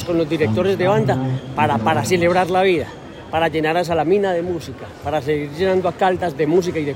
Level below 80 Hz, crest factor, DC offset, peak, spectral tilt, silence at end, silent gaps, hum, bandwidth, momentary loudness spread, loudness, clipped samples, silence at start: -50 dBFS; 14 dB; under 0.1%; -4 dBFS; -6 dB/octave; 0 s; none; none; 16 kHz; 8 LU; -18 LUFS; under 0.1%; 0 s